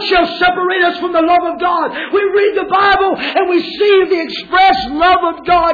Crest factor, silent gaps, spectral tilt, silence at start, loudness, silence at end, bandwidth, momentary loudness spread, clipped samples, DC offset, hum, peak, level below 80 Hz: 10 dB; none; -5 dB/octave; 0 s; -12 LUFS; 0 s; 5 kHz; 5 LU; under 0.1%; under 0.1%; none; -2 dBFS; -42 dBFS